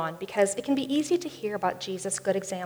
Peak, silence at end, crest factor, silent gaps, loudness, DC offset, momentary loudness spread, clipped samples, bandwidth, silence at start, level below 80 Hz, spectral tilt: -10 dBFS; 0 s; 18 dB; none; -28 LUFS; under 0.1%; 5 LU; under 0.1%; over 20 kHz; 0 s; -70 dBFS; -4 dB/octave